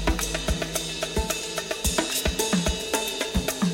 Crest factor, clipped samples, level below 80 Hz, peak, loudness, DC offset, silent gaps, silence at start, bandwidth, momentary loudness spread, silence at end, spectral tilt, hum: 18 dB; under 0.1%; -34 dBFS; -8 dBFS; -26 LUFS; under 0.1%; none; 0 s; 17 kHz; 4 LU; 0 s; -3 dB/octave; none